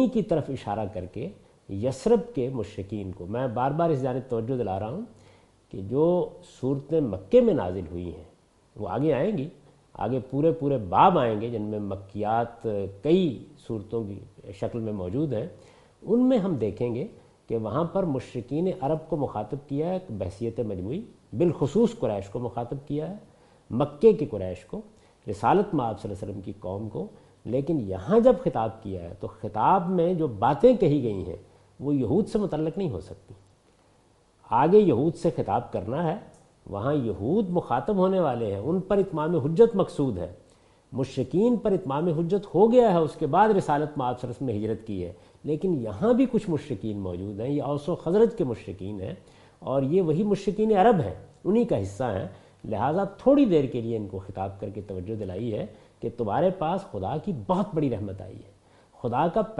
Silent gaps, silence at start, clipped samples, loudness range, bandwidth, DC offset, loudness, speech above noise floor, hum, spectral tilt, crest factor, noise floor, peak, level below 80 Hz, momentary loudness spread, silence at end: none; 0 s; under 0.1%; 5 LU; 11.5 kHz; under 0.1%; -26 LUFS; 36 dB; none; -8.5 dB/octave; 20 dB; -61 dBFS; -6 dBFS; -54 dBFS; 16 LU; 0 s